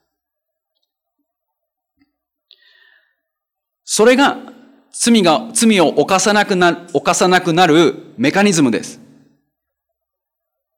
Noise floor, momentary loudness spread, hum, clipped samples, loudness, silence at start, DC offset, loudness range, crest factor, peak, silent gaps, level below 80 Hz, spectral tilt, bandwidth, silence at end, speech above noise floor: -80 dBFS; 8 LU; none; under 0.1%; -13 LUFS; 3.85 s; under 0.1%; 6 LU; 16 dB; -2 dBFS; none; -60 dBFS; -3.5 dB/octave; 17 kHz; 1.85 s; 67 dB